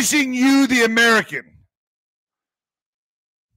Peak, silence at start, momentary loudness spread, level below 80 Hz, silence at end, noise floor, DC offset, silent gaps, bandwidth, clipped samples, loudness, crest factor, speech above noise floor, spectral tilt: -6 dBFS; 0 s; 12 LU; -62 dBFS; 2.15 s; under -90 dBFS; under 0.1%; none; 16 kHz; under 0.1%; -15 LUFS; 14 dB; over 74 dB; -2 dB/octave